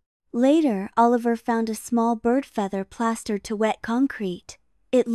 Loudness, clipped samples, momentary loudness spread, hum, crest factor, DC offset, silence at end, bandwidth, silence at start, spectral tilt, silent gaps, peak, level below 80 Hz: -23 LUFS; under 0.1%; 9 LU; none; 16 dB; under 0.1%; 0 s; 13 kHz; 0.35 s; -5.5 dB/octave; none; -8 dBFS; -60 dBFS